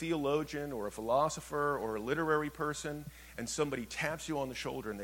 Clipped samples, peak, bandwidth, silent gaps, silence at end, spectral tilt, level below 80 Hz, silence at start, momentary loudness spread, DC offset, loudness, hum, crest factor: under 0.1%; -18 dBFS; 17.5 kHz; none; 0 s; -4.5 dB/octave; -58 dBFS; 0 s; 8 LU; under 0.1%; -35 LUFS; none; 18 dB